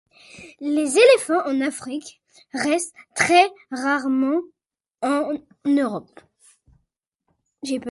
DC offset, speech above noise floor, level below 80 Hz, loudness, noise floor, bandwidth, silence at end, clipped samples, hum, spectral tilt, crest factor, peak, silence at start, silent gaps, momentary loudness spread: under 0.1%; 55 dB; -68 dBFS; -21 LUFS; -75 dBFS; 11.5 kHz; 0 s; under 0.1%; none; -3 dB/octave; 20 dB; -2 dBFS; 0.35 s; none; 16 LU